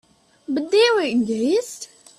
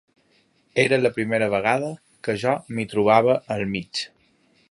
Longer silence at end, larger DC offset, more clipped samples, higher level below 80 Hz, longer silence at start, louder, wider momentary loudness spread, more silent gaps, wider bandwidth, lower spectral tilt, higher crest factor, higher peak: second, 0.35 s vs 0.65 s; neither; neither; second, -68 dBFS vs -60 dBFS; second, 0.5 s vs 0.75 s; about the same, -20 LUFS vs -22 LUFS; first, 18 LU vs 12 LU; neither; first, 14 kHz vs 11.5 kHz; second, -3.5 dB/octave vs -5.5 dB/octave; about the same, 16 dB vs 20 dB; second, -6 dBFS vs -2 dBFS